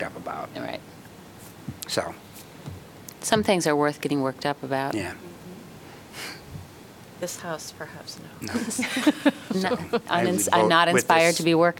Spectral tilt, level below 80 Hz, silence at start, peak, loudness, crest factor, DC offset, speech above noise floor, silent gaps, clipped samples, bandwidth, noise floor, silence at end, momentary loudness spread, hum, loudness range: -4 dB/octave; -62 dBFS; 0 s; -4 dBFS; -24 LUFS; 22 dB; under 0.1%; 22 dB; none; under 0.1%; 18 kHz; -46 dBFS; 0 s; 24 LU; none; 13 LU